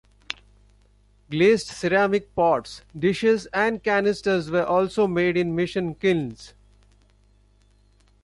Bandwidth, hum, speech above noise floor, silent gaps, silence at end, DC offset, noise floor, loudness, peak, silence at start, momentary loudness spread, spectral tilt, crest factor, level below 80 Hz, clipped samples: 11.5 kHz; 50 Hz at -50 dBFS; 36 dB; none; 1.75 s; under 0.1%; -58 dBFS; -22 LUFS; -4 dBFS; 1.3 s; 15 LU; -6 dB/octave; 20 dB; -54 dBFS; under 0.1%